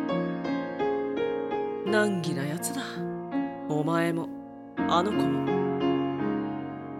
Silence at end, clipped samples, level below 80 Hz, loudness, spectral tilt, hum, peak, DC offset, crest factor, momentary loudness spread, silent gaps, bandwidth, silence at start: 0 s; under 0.1%; -64 dBFS; -29 LUFS; -5.5 dB/octave; none; -10 dBFS; under 0.1%; 18 dB; 8 LU; none; 14 kHz; 0 s